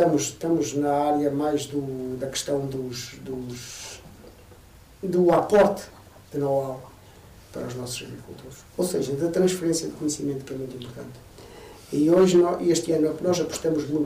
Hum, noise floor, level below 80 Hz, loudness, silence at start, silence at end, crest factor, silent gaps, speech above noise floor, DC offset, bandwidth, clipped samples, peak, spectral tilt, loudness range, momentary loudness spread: none; -49 dBFS; -56 dBFS; -24 LUFS; 0 s; 0 s; 16 dB; none; 25 dB; under 0.1%; 16 kHz; under 0.1%; -10 dBFS; -5.5 dB/octave; 8 LU; 21 LU